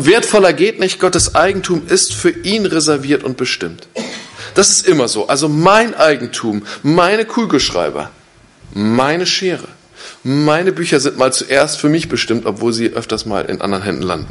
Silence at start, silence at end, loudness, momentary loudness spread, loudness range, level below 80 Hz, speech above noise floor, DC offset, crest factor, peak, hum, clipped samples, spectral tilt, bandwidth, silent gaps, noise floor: 0 s; 0 s; -13 LUFS; 11 LU; 4 LU; -42 dBFS; 30 dB; under 0.1%; 14 dB; 0 dBFS; none; under 0.1%; -3.5 dB/octave; 11.5 kHz; none; -44 dBFS